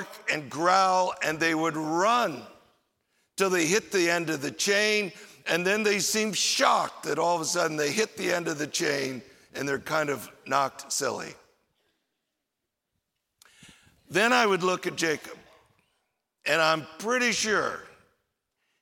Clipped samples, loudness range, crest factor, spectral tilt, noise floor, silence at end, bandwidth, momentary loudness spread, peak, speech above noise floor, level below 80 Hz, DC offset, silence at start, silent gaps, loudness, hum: under 0.1%; 7 LU; 22 dB; -2.5 dB/octave; -84 dBFS; 0.95 s; 16.5 kHz; 12 LU; -6 dBFS; 58 dB; -72 dBFS; under 0.1%; 0 s; none; -26 LUFS; none